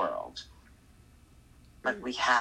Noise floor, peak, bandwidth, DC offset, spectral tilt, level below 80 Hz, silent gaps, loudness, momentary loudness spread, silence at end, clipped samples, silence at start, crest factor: -58 dBFS; -12 dBFS; 14.5 kHz; under 0.1%; -2.5 dB/octave; -60 dBFS; none; -33 LUFS; 17 LU; 0 s; under 0.1%; 0 s; 22 dB